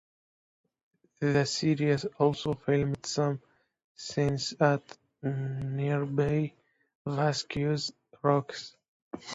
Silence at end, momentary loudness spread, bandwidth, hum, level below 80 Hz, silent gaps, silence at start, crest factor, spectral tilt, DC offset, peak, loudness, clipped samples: 0 s; 12 LU; 8 kHz; none; -60 dBFS; 3.84-3.95 s, 6.95-7.05 s, 8.88-9.11 s; 1.2 s; 20 dB; -6 dB/octave; under 0.1%; -10 dBFS; -30 LUFS; under 0.1%